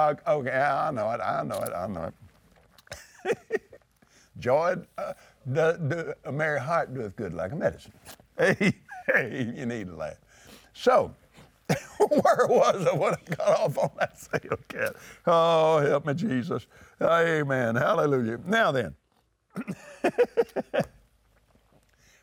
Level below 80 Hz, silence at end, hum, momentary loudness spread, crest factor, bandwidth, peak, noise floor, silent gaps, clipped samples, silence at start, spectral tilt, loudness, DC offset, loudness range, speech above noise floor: -64 dBFS; 1.35 s; none; 15 LU; 18 dB; over 20 kHz; -10 dBFS; -70 dBFS; none; under 0.1%; 0 s; -6 dB/octave; -26 LUFS; under 0.1%; 7 LU; 44 dB